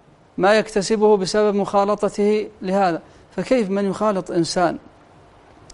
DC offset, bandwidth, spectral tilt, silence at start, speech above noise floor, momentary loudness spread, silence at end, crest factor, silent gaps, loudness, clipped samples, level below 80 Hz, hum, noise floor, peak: under 0.1%; 11.5 kHz; -5 dB/octave; 0.4 s; 30 dB; 9 LU; 0.95 s; 18 dB; none; -19 LUFS; under 0.1%; -52 dBFS; none; -49 dBFS; -2 dBFS